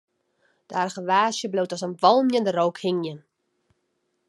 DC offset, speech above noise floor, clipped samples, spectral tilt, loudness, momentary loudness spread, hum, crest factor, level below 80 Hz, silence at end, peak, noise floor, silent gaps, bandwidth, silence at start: under 0.1%; 51 dB; under 0.1%; -4.5 dB/octave; -23 LUFS; 10 LU; none; 22 dB; -82 dBFS; 1.1 s; -4 dBFS; -74 dBFS; none; 12 kHz; 0.7 s